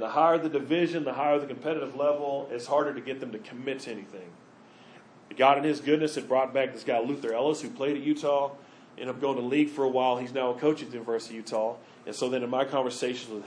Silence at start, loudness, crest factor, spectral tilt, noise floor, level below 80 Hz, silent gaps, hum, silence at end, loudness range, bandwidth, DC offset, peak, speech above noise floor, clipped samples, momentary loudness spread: 0 s; -28 LUFS; 20 dB; -5 dB/octave; -53 dBFS; -84 dBFS; none; none; 0 s; 4 LU; 10.5 kHz; under 0.1%; -8 dBFS; 25 dB; under 0.1%; 12 LU